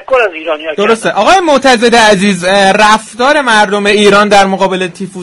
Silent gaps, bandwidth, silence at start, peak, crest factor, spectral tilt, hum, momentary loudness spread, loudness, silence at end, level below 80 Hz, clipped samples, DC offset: none; 13 kHz; 0 s; 0 dBFS; 8 dB; -3.5 dB/octave; none; 7 LU; -8 LUFS; 0 s; -40 dBFS; 0.9%; under 0.1%